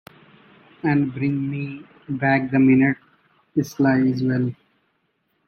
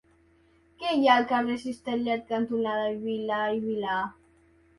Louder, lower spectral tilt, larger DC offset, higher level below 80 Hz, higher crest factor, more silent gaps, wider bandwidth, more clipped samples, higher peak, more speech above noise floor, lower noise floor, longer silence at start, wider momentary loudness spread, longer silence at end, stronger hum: first, -21 LUFS vs -27 LUFS; first, -8 dB/octave vs -5.5 dB/octave; neither; first, -60 dBFS vs -66 dBFS; about the same, 16 dB vs 20 dB; neither; first, 13.5 kHz vs 11.5 kHz; neither; about the same, -6 dBFS vs -8 dBFS; first, 50 dB vs 35 dB; first, -70 dBFS vs -62 dBFS; about the same, 0.85 s vs 0.8 s; first, 14 LU vs 10 LU; first, 0.95 s vs 0.65 s; neither